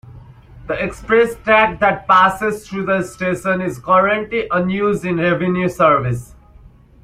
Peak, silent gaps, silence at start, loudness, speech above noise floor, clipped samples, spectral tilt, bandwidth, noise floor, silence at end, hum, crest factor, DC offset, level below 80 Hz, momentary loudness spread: 0 dBFS; none; 0.15 s; -16 LUFS; 28 dB; under 0.1%; -6 dB/octave; 15.5 kHz; -44 dBFS; 0.8 s; none; 16 dB; under 0.1%; -44 dBFS; 10 LU